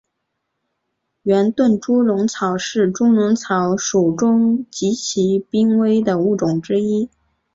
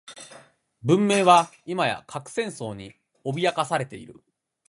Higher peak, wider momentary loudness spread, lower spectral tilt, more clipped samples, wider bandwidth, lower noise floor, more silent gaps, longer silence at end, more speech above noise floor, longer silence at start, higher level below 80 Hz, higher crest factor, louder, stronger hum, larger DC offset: about the same, -4 dBFS vs -2 dBFS; second, 5 LU vs 21 LU; about the same, -5.5 dB/octave vs -5 dB/octave; neither; second, 7.8 kHz vs 11.5 kHz; first, -75 dBFS vs -52 dBFS; neither; about the same, 0.45 s vs 0.55 s; first, 58 dB vs 29 dB; first, 1.25 s vs 0.1 s; first, -58 dBFS vs -66 dBFS; second, 14 dB vs 22 dB; first, -17 LUFS vs -23 LUFS; neither; neither